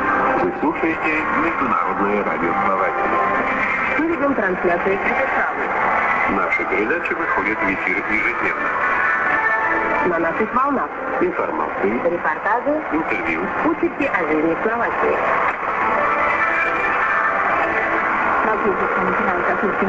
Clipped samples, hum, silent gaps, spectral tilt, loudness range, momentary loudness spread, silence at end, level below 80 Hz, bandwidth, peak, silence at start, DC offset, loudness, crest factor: under 0.1%; none; none; -6.5 dB/octave; 2 LU; 3 LU; 0 s; -48 dBFS; 7.8 kHz; -4 dBFS; 0 s; under 0.1%; -18 LUFS; 16 dB